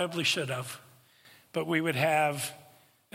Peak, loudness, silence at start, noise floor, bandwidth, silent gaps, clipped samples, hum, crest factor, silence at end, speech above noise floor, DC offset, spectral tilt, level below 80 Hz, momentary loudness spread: -12 dBFS; -29 LUFS; 0 s; -59 dBFS; 16.5 kHz; none; under 0.1%; none; 20 dB; 0.5 s; 29 dB; under 0.1%; -4 dB/octave; -76 dBFS; 12 LU